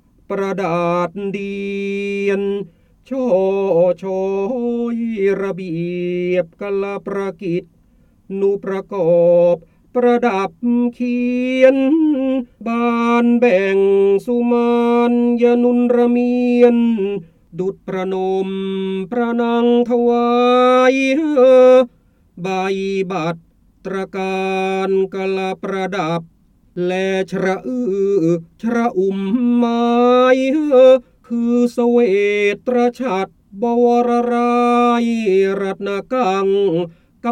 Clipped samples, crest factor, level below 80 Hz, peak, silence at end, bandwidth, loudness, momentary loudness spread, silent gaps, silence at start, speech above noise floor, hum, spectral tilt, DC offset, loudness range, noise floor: under 0.1%; 16 dB; -56 dBFS; 0 dBFS; 0 s; 9.4 kHz; -16 LUFS; 11 LU; none; 0.3 s; 37 dB; none; -7 dB/octave; under 0.1%; 7 LU; -53 dBFS